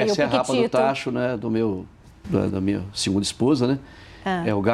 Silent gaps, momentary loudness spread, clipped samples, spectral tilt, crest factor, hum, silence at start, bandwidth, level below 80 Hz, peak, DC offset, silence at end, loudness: none; 7 LU; under 0.1%; -5.5 dB/octave; 18 dB; none; 0 s; 13 kHz; -52 dBFS; -4 dBFS; under 0.1%; 0 s; -23 LUFS